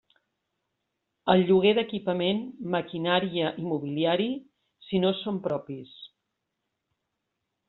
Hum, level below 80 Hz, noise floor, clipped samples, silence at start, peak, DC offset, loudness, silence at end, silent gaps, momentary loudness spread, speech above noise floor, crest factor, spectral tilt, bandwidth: none; -68 dBFS; -82 dBFS; under 0.1%; 1.25 s; -6 dBFS; under 0.1%; -27 LUFS; 1.6 s; none; 14 LU; 56 dB; 22 dB; -4.5 dB/octave; 4.3 kHz